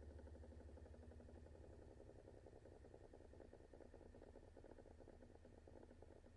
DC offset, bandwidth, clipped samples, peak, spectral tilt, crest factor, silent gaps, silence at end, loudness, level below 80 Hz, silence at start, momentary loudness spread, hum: under 0.1%; 10 kHz; under 0.1%; -48 dBFS; -7.5 dB/octave; 14 dB; none; 0 s; -64 LUFS; -68 dBFS; 0 s; 4 LU; none